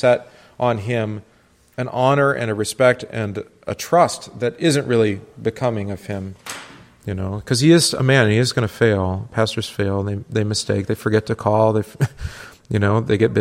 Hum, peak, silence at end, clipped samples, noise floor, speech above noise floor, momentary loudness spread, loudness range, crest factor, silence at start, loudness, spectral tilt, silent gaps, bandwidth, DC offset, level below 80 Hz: none; -2 dBFS; 0 s; under 0.1%; -55 dBFS; 36 dB; 14 LU; 3 LU; 18 dB; 0 s; -19 LUFS; -5.5 dB/octave; none; 16 kHz; under 0.1%; -48 dBFS